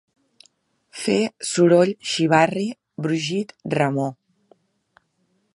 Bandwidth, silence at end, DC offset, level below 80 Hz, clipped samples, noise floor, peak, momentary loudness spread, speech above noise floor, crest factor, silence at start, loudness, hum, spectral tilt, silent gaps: 11.5 kHz; 1.4 s; under 0.1%; -68 dBFS; under 0.1%; -68 dBFS; -2 dBFS; 13 LU; 48 dB; 22 dB; 0.95 s; -21 LUFS; none; -5 dB/octave; none